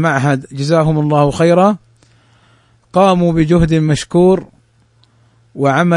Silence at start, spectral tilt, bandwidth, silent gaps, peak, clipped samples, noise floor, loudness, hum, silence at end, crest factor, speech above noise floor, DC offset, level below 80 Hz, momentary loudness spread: 0 s; -7 dB/octave; 11 kHz; none; 0 dBFS; under 0.1%; -53 dBFS; -13 LUFS; none; 0 s; 14 dB; 41 dB; under 0.1%; -36 dBFS; 7 LU